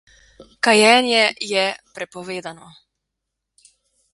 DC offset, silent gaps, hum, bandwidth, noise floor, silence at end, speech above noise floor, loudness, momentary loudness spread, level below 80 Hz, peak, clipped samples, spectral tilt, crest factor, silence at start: under 0.1%; none; none; 11.5 kHz; -80 dBFS; 1.6 s; 62 dB; -16 LUFS; 19 LU; -64 dBFS; 0 dBFS; under 0.1%; -2 dB/octave; 22 dB; 0.65 s